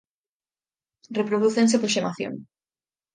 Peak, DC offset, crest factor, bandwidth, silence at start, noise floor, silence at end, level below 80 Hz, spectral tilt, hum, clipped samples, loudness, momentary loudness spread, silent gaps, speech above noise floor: -8 dBFS; under 0.1%; 18 dB; 9.8 kHz; 1.1 s; under -90 dBFS; 0.7 s; -74 dBFS; -4 dB/octave; none; under 0.1%; -23 LUFS; 13 LU; none; over 67 dB